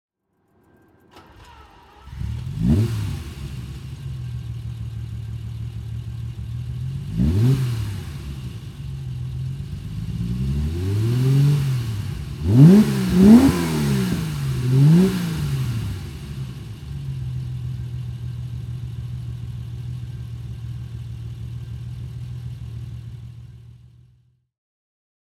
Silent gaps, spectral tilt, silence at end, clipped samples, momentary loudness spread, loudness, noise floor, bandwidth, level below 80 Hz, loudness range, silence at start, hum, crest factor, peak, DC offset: none; -8 dB/octave; 1.55 s; under 0.1%; 18 LU; -21 LUFS; -66 dBFS; 16 kHz; -36 dBFS; 17 LU; 1.15 s; none; 22 dB; 0 dBFS; under 0.1%